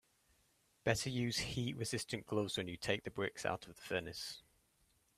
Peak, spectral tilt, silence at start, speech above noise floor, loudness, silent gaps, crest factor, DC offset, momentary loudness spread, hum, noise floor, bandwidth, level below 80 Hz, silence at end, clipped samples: -18 dBFS; -4 dB/octave; 0.85 s; 35 dB; -40 LUFS; none; 24 dB; under 0.1%; 8 LU; none; -76 dBFS; 15.5 kHz; -66 dBFS; 0.75 s; under 0.1%